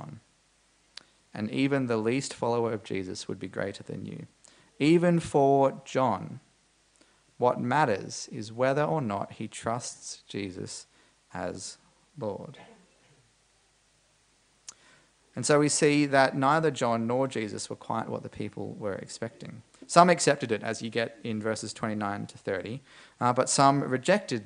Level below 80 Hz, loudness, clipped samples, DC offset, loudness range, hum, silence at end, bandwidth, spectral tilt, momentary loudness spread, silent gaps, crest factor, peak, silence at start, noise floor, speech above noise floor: -68 dBFS; -28 LUFS; under 0.1%; under 0.1%; 14 LU; none; 0 s; 10.5 kHz; -5 dB/octave; 18 LU; none; 28 dB; -2 dBFS; 0 s; -66 dBFS; 39 dB